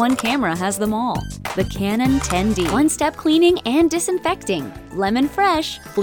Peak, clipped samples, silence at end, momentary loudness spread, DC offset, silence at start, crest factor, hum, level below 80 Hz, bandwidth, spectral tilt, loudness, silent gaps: -4 dBFS; under 0.1%; 0 s; 8 LU; under 0.1%; 0 s; 14 dB; none; -38 dBFS; 20 kHz; -4.5 dB/octave; -19 LUFS; none